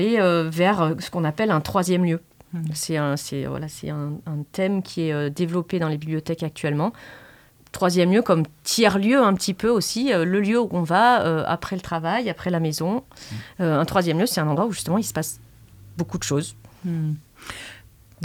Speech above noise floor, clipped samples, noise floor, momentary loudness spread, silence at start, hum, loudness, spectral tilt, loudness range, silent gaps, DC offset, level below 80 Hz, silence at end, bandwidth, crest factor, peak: 29 dB; under 0.1%; -51 dBFS; 13 LU; 0 s; none; -22 LUFS; -5.5 dB/octave; 7 LU; none; under 0.1%; -54 dBFS; 0 s; 20 kHz; 18 dB; -4 dBFS